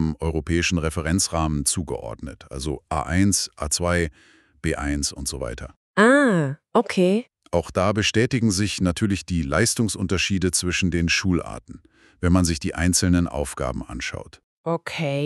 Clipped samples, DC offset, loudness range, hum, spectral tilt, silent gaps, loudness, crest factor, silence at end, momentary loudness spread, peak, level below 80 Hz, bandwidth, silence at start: under 0.1%; under 0.1%; 4 LU; none; -4.5 dB/octave; 5.77-5.94 s, 14.43-14.64 s; -22 LUFS; 20 dB; 0 s; 11 LU; -4 dBFS; -38 dBFS; 13.5 kHz; 0 s